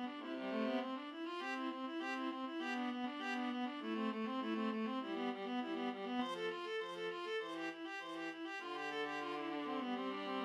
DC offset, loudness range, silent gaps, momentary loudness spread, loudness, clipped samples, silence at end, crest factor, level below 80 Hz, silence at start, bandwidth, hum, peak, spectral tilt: under 0.1%; 2 LU; none; 5 LU; -42 LUFS; under 0.1%; 0 s; 14 dB; under -90 dBFS; 0 s; 12 kHz; none; -28 dBFS; -4.5 dB/octave